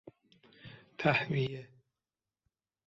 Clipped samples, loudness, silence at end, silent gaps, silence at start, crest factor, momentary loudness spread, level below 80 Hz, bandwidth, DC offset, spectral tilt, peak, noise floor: under 0.1%; -32 LUFS; 1.2 s; none; 0.05 s; 24 dB; 24 LU; -70 dBFS; 7.4 kHz; under 0.1%; -4.5 dB/octave; -14 dBFS; under -90 dBFS